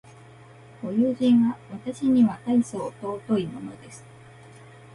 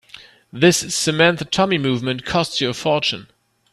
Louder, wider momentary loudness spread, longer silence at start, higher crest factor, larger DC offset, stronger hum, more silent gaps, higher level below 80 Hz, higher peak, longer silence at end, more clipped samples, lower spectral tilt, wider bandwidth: second, -24 LUFS vs -18 LUFS; first, 19 LU vs 7 LU; first, 0.8 s vs 0.15 s; about the same, 16 dB vs 20 dB; neither; neither; neither; second, -64 dBFS vs -52 dBFS; second, -10 dBFS vs 0 dBFS; first, 0.95 s vs 0.5 s; neither; first, -7 dB/octave vs -4 dB/octave; second, 11.5 kHz vs 14 kHz